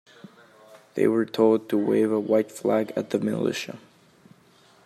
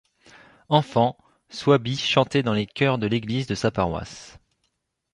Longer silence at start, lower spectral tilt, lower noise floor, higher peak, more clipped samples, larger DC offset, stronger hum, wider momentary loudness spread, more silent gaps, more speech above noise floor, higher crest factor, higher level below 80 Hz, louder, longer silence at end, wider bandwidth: about the same, 0.75 s vs 0.7 s; about the same, -6 dB/octave vs -6 dB/octave; second, -57 dBFS vs -75 dBFS; second, -8 dBFS vs -4 dBFS; neither; neither; neither; about the same, 11 LU vs 9 LU; neither; second, 34 dB vs 52 dB; about the same, 18 dB vs 22 dB; second, -74 dBFS vs -50 dBFS; about the same, -24 LUFS vs -23 LUFS; first, 1.1 s vs 0.85 s; first, 14 kHz vs 11 kHz